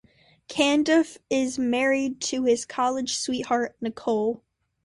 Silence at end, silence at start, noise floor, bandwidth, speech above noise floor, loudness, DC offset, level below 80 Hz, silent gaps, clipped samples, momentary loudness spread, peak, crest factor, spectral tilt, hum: 0.5 s; 0.5 s; -48 dBFS; 11.5 kHz; 24 dB; -25 LUFS; under 0.1%; -64 dBFS; none; under 0.1%; 8 LU; -8 dBFS; 18 dB; -3 dB/octave; none